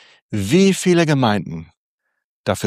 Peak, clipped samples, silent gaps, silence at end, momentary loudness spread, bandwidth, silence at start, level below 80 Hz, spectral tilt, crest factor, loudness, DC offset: -2 dBFS; under 0.1%; 1.77-1.98 s, 2.24-2.44 s; 0 s; 15 LU; 15.5 kHz; 0.3 s; -54 dBFS; -5.5 dB/octave; 16 dB; -17 LUFS; under 0.1%